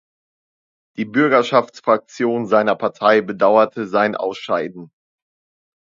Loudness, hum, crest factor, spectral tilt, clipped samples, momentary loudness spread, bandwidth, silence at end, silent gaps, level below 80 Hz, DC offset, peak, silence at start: -17 LUFS; none; 18 dB; -6 dB/octave; under 0.1%; 8 LU; 7.6 kHz; 1 s; none; -68 dBFS; under 0.1%; 0 dBFS; 1 s